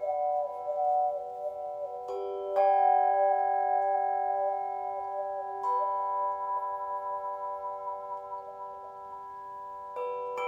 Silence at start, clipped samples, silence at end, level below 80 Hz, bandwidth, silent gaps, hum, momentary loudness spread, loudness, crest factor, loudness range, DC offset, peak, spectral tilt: 0 s; under 0.1%; 0 s; -74 dBFS; 7.2 kHz; none; none; 16 LU; -31 LUFS; 16 dB; 10 LU; under 0.1%; -14 dBFS; -5 dB/octave